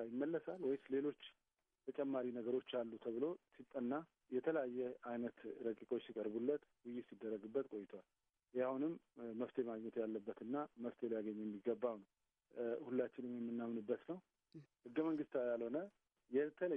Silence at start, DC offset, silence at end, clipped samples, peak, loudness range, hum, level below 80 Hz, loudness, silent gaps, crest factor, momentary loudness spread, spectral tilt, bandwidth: 0 s; under 0.1%; 0 s; under 0.1%; -26 dBFS; 2 LU; none; under -90 dBFS; -45 LUFS; none; 18 dB; 11 LU; -8.5 dB/octave; 3.8 kHz